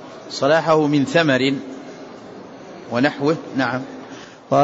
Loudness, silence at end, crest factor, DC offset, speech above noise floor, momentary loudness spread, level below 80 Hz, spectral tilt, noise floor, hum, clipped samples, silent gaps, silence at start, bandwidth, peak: -19 LUFS; 0 s; 16 dB; under 0.1%; 20 dB; 22 LU; -64 dBFS; -5.5 dB/octave; -38 dBFS; none; under 0.1%; none; 0 s; 8 kHz; -4 dBFS